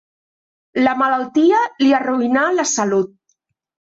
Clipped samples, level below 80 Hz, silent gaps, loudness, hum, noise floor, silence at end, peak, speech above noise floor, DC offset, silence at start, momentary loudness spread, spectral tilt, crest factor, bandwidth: under 0.1%; -64 dBFS; none; -16 LUFS; none; -68 dBFS; 0.9 s; -4 dBFS; 53 dB; under 0.1%; 0.75 s; 5 LU; -3.5 dB/octave; 14 dB; 8 kHz